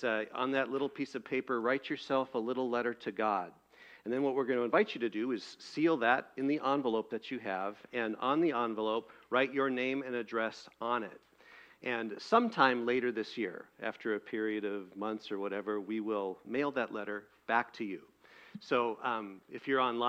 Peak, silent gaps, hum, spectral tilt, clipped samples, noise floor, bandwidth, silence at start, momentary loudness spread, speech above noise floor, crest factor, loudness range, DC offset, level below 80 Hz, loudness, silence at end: -10 dBFS; none; none; -5.5 dB/octave; under 0.1%; -59 dBFS; 9.2 kHz; 0 s; 10 LU; 25 dB; 24 dB; 4 LU; under 0.1%; -80 dBFS; -34 LUFS; 0 s